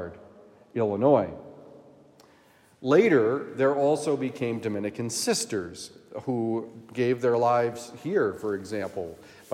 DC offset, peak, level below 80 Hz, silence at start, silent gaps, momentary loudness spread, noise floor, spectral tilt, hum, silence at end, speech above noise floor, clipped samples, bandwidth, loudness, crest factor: under 0.1%; -8 dBFS; -72 dBFS; 0 s; none; 15 LU; -59 dBFS; -5 dB/octave; none; 0 s; 33 dB; under 0.1%; 15.5 kHz; -26 LUFS; 20 dB